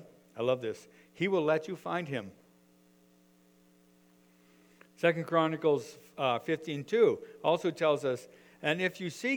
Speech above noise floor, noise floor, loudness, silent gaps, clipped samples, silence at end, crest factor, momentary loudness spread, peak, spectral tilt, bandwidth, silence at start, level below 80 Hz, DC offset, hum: 33 dB; -64 dBFS; -31 LUFS; none; under 0.1%; 0 s; 22 dB; 11 LU; -12 dBFS; -5.5 dB/octave; over 20 kHz; 0 s; -80 dBFS; under 0.1%; none